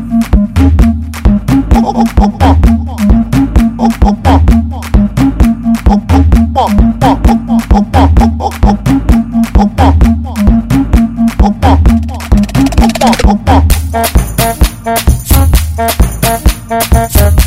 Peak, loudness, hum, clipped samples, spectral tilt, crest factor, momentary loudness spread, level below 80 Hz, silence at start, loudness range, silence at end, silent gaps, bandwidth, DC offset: 0 dBFS; -9 LUFS; none; 3%; -6.5 dB/octave; 8 dB; 4 LU; -12 dBFS; 0 s; 1 LU; 0 s; none; 16.5 kHz; 0.4%